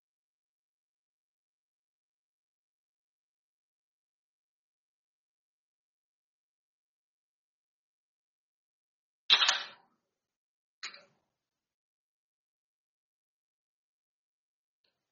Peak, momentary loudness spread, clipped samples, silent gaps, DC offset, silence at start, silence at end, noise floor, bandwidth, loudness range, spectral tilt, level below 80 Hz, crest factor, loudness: -8 dBFS; 22 LU; under 0.1%; 10.36-10.82 s; under 0.1%; 9.3 s; 4.2 s; -89 dBFS; 6.6 kHz; 22 LU; 6 dB/octave; under -90 dBFS; 36 dB; -26 LUFS